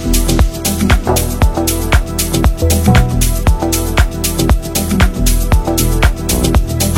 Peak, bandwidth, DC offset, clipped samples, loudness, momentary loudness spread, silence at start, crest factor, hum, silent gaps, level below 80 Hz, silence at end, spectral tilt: 0 dBFS; 17 kHz; under 0.1%; under 0.1%; -13 LUFS; 3 LU; 0 s; 12 dB; none; none; -14 dBFS; 0 s; -4.5 dB/octave